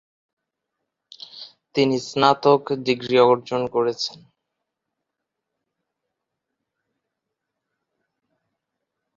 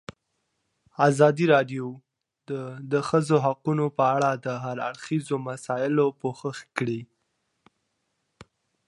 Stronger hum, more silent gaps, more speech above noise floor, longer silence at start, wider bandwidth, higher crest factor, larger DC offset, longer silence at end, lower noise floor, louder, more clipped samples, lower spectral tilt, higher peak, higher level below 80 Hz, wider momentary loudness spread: neither; neither; first, 63 dB vs 52 dB; first, 1.35 s vs 1 s; second, 7.8 kHz vs 11.5 kHz; about the same, 24 dB vs 22 dB; neither; first, 5 s vs 1.85 s; first, -82 dBFS vs -77 dBFS; first, -20 LUFS vs -25 LUFS; neither; second, -5 dB/octave vs -6.5 dB/octave; about the same, -2 dBFS vs -4 dBFS; about the same, -66 dBFS vs -70 dBFS; first, 21 LU vs 14 LU